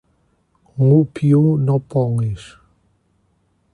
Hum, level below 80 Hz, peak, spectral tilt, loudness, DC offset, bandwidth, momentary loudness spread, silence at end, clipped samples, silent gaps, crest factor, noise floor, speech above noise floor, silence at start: none; -50 dBFS; -4 dBFS; -10 dB/octave; -17 LUFS; under 0.1%; 10.5 kHz; 12 LU; 1.3 s; under 0.1%; none; 16 dB; -63 dBFS; 47 dB; 0.75 s